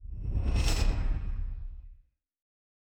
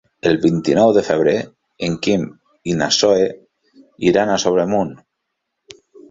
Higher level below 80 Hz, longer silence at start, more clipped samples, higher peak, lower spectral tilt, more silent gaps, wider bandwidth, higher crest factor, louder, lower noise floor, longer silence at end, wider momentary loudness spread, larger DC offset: first, -32 dBFS vs -52 dBFS; second, 0 s vs 0.25 s; neither; second, -14 dBFS vs -2 dBFS; about the same, -5 dB/octave vs -4.5 dB/octave; neither; first, 14 kHz vs 8 kHz; about the same, 16 dB vs 16 dB; second, -33 LUFS vs -17 LUFS; second, -60 dBFS vs -76 dBFS; second, 0.9 s vs 1.15 s; first, 16 LU vs 11 LU; neither